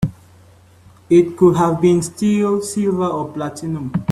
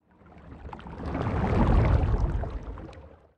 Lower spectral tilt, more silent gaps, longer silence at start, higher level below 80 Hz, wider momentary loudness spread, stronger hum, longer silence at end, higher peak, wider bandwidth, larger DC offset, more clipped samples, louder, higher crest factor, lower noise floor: second, -7 dB/octave vs -9 dB/octave; neither; second, 0 s vs 0.35 s; second, -48 dBFS vs -30 dBFS; second, 11 LU vs 21 LU; neither; second, 0 s vs 0.3 s; first, -2 dBFS vs -10 dBFS; first, 13.5 kHz vs 6.6 kHz; neither; neither; first, -17 LUFS vs -27 LUFS; about the same, 16 dB vs 16 dB; second, -47 dBFS vs -51 dBFS